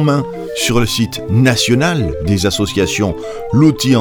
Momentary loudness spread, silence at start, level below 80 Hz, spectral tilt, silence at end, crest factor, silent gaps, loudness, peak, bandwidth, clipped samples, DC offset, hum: 6 LU; 0 s; -32 dBFS; -5 dB/octave; 0 s; 14 dB; none; -14 LUFS; 0 dBFS; 19.5 kHz; under 0.1%; under 0.1%; none